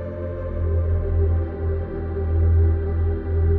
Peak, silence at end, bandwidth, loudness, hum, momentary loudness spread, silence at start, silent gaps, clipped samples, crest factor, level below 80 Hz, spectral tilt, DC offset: -10 dBFS; 0 s; 2.4 kHz; -23 LUFS; none; 9 LU; 0 s; none; under 0.1%; 10 dB; -28 dBFS; -13 dB/octave; under 0.1%